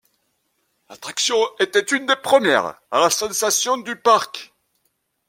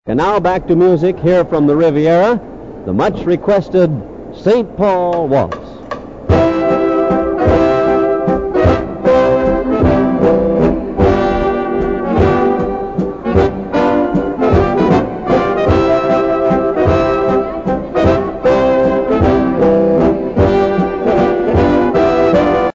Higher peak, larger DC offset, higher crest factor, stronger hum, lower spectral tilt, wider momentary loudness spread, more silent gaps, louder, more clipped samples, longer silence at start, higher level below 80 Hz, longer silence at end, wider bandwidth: about the same, -2 dBFS vs 0 dBFS; second, under 0.1% vs 0.5%; first, 20 dB vs 12 dB; neither; second, -1 dB/octave vs -8.5 dB/octave; first, 9 LU vs 5 LU; neither; second, -18 LUFS vs -13 LUFS; neither; first, 0.9 s vs 0.05 s; second, -66 dBFS vs -30 dBFS; first, 0.85 s vs 0.05 s; first, 16.5 kHz vs 7.6 kHz